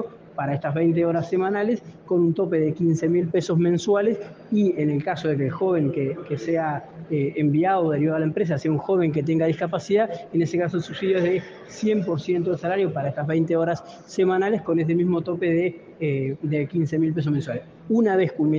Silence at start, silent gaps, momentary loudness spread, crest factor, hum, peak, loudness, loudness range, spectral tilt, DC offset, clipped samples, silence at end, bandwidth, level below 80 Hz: 0 s; none; 7 LU; 14 dB; none; -10 dBFS; -23 LUFS; 2 LU; -8 dB/octave; under 0.1%; under 0.1%; 0 s; 7.6 kHz; -64 dBFS